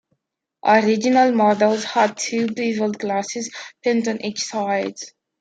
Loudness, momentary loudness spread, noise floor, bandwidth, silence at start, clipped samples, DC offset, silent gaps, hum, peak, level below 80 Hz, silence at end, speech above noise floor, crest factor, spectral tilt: -20 LUFS; 12 LU; -77 dBFS; 9.2 kHz; 0.65 s; under 0.1%; under 0.1%; none; none; -2 dBFS; -70 dBFS; 0.3 s; 58 dB; 18 dB; -4 dB/octave